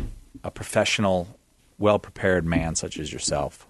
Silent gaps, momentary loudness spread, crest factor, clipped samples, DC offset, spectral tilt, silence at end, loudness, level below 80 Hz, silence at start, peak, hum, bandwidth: none; 16 LU; 20 dB; under 0.1%; under 0.1%; -4 dB/octave; 0.15 s; -24 LUFS; -42 dBFS; 0 s; -4 dBFS; none; 12.5 kHz